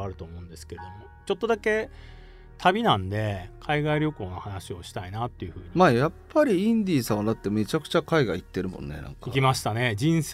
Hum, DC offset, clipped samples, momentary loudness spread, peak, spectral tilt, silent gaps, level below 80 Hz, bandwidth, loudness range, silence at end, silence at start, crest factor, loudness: none; under 0.1%; under 0.1%; 17 LU; -6 dBFS; -6 dB/octave; none; -48 dBFS; 16 kHz; 3 LU; 0 s; 0 s; 20 dB; -25 LUFS